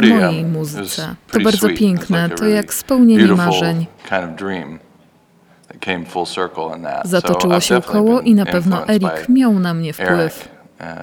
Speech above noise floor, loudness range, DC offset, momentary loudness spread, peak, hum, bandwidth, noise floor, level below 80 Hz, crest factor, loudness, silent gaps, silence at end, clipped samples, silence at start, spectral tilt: 36 dB; 8 LU; under 0.1%; 12 LU; 0 dBFS; none; 18.5 kHz; -51 dBFS; -50 dBFS; 16 dB; -15 LUFS; none; 0 s; under 0.1%; 0 s; -5.5 dB/octave